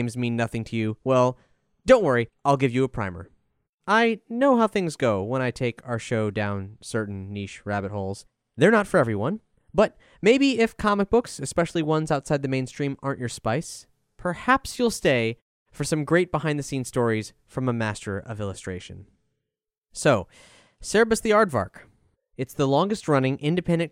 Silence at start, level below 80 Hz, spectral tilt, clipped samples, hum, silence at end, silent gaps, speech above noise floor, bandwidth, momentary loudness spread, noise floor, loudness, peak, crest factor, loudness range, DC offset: 0 s; -52 dBFS; -5.5 dB/octave; under 0.1%; none; 0.05 s; 3.69-3.78 s, 15.42-15.66 s; 62 dB; 16 kHz; 14 LU; -85 dBFS; -24 LUFS; -2 dBFS; 22 dB; 6 LU; under 0.1%